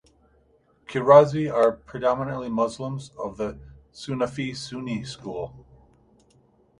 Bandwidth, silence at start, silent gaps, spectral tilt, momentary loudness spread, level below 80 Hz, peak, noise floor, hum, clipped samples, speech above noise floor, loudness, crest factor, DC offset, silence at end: 11 kHz; 0.9 s; none; -6.5 dB/octave; 19 LU; -56 dBFS; -2 dBFS; -62 dBFS; none; under 0.1%; 39 dB; -24 LUFS; 24 dB; under 0.1%; 1.2 s